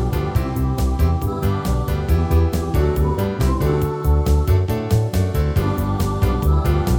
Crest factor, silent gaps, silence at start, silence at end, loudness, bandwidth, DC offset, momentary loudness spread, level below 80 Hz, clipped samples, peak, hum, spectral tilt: 14 dB; none; 0 s; 0 s; -19 LUFS; 20 kHz; under 0.1%; 4 LU; -22 dBFS; under 0.1%; -4 dBFS; none; -7.5 dB/octave